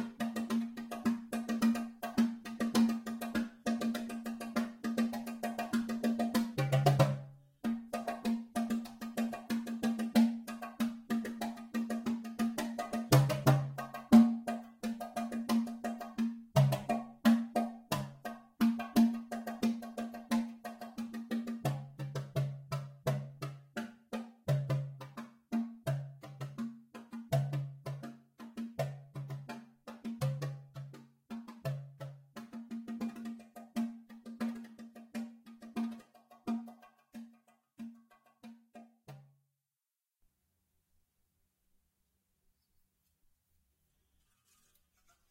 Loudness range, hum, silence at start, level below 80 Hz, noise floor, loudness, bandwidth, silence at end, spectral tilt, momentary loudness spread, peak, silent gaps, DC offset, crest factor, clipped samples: 13 LU; none; 0 s; -68 dBFS; under -90 dBFS; -35 LUFS; 16.5 kHz; 6.1 s; -6.5 dB/octave; 19 LU; -12 dBFS; none; under 0.1%; 24 dB; under 0.1%